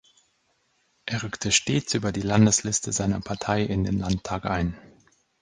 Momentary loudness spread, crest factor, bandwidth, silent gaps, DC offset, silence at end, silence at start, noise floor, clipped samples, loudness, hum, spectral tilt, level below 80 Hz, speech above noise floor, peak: 11 LU; 22 dB; 10 kHz; none; under 0.1%; 0.6 s; 1.05 s; -69 dBFS; under 0.1%; -25 LUFS; none; -4 dB/octave; -44 dBFS; 45 dB; -4 dBFS